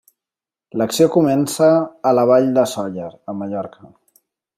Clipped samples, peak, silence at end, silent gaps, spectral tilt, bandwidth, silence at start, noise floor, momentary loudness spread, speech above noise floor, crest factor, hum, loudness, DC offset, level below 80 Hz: under 0.1%; -2 dBFS; 0.9 s; none; -6 dB/octave; 16 kHz; 0.75 s; -89 dBFS; 15 LU; 73 dB; 16 dB; none; -17 LUFS; under 0.1%; -64 dBFS